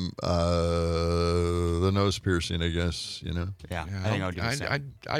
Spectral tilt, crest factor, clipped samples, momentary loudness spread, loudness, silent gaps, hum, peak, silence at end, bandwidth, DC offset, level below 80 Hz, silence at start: -5.5 dB/octave; 16 dB; under 0.1%; 8 LU; -28 LUFS; none; none; -12 dBFS; 0 s; 14 kHz; under 0.1%; -46 dBFS; 0 s